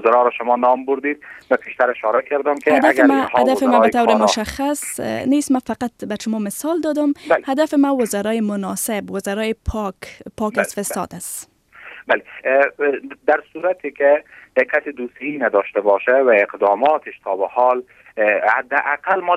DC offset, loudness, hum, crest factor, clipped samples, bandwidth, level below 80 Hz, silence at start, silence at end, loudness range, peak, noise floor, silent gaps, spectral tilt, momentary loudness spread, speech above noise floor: under 0.1%; -18 LUFS; none; 18 dB; under 0.1%; 16 kHz; -46 dBFS; 0 s; 0 s; 6 LU; 0 dBFS; -41 dBFS; none; -4 dB/octave; 11 LU; 23 dB